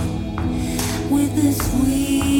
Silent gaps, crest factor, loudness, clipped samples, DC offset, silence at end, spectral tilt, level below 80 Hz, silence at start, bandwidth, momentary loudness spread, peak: none; 14 dB; -20 LUFS; under 0.1%; under 0.1%; 0 s; -5.5 dB/octave; -30 dBFS; 0 s; 18 kHz; 6 LU; -6 dBFS